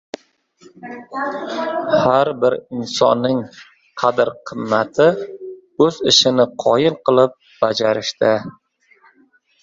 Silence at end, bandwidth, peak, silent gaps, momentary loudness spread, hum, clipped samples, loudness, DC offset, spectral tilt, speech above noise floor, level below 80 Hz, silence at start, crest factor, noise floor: 1.1 s; 7.8 kHz; 0 dBFS; none; 20 LU; none; under 0.1%; -17 LUFS; under 0.1%; -4 dB/octave; 39 dB; -58 dBFS; 0.8 s; 18 dB; -56 dBFS